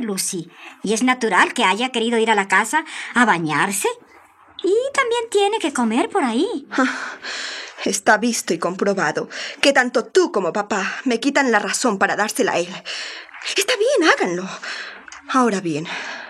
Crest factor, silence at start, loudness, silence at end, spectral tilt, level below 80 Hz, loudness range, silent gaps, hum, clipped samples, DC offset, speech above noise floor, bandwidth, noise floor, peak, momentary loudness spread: 18 dB; 0 s; -19 LUFS; 0 s; -3 dB/octave; -70 dBFS; 3 LU; none; none; under 0.1%; under 0.1%; 29 dB; 15 kHz; -49 dBFS; -2 dBFS; 12 LU